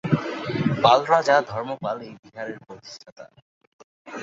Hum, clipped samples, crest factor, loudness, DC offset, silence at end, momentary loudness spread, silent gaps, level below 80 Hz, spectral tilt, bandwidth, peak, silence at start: none; under 0.1%; 22 dB; -21 LUFS; under 0.1%; 0 s; 23 LU; 2.19-2.23 s, 3.12-3.16 s, 3.42-3.61 s, 3.67-4.05 s; -60 dBFS; -6 dB/octave; 7.8 kHz; -2 dBFS; 0.05 s